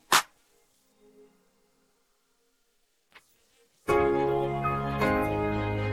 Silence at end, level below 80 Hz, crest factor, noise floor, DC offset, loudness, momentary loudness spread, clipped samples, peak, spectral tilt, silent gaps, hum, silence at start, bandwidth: 0 s; -48 dBFS; 22 dB; -72 dBFS; under 0.1%; -27 LUFS; 5 LU; under 0.1%; -8 dBFS; -4.5 dB/octave; none; none; 0.1 s; 16.5 kHz